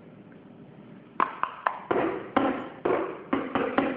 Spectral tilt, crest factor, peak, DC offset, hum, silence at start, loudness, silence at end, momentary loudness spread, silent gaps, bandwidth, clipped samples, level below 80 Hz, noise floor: -9 dB/octave; 24 dB; -6 dBFS; under 0.1%; none; 0 s; -29 LUFS; 0 s; 22 LU; none; 4.8 kHz; under 0.1%; -64 dBFS; -49 dBFS